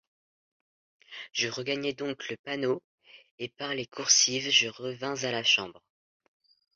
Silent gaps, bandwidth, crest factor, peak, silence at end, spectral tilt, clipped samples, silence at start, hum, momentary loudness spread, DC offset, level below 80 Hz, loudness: 2.39-2.44 s, 2.84-2.98 s, 3.31-3.38 s; 7.8 kHz; 24 dB; -8 dBFS; 1.05 s; -1 dB/octave; under 0.1%; 1.1 s; none; 17 LU; under 0.1%; -76 dBFS; -27 LUFS